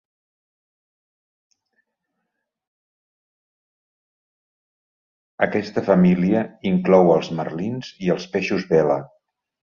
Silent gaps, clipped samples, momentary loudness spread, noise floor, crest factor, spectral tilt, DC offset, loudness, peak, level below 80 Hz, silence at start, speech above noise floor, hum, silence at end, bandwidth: none; under 0.1%; 11 LU; -79 dBFS; 22 dB; -8 dB/octave; under 0.1%; -20 LUFS; -2 dBFS; -58 dBFS; 5.4 s; 60 dB; none; 0.7 s; 7 kHz